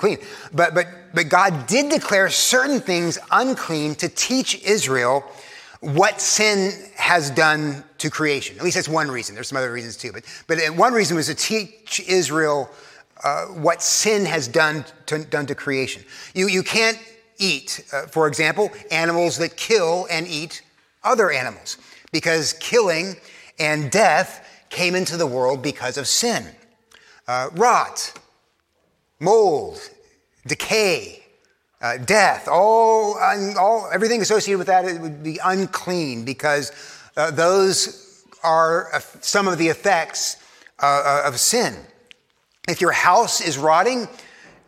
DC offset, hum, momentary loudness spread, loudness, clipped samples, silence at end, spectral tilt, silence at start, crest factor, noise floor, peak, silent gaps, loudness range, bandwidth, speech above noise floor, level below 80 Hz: under 0.1%; none; 12 LU; -19 LUFS; under 0.1%; 0.5 s; -3 dB/octave; 0 s; 20 dB; -66 dBFS; 0 dBFS; none; 4 LU; 16.5 kHz; 47 dB; -66 dBFS